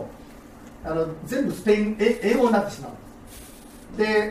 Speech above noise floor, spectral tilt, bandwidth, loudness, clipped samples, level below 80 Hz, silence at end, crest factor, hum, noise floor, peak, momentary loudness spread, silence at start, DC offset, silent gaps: 22 dB; -5.5 dB/octave; 15.5 kHz; -23 LUFS; under 0.1%; -48 dBFS; 0 s; 18 dB; none; -44 dBFS; -8 dBFS; 24 LU; 0 s; under 0.1%; none